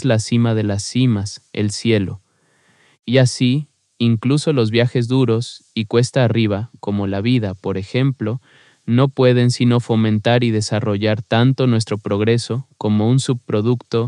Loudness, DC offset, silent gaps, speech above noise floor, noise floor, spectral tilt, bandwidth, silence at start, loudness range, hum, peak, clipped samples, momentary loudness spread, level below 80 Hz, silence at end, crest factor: -18 LUFS; under 0.1%; none; 42 dB; -58 dBFS; -6.5 dB/octave; 11 kHz; 0 s; 3 LU; none; -2 dBFS; under 0.1%; 9 LU; -62 dBFS; 0 s; 16 dB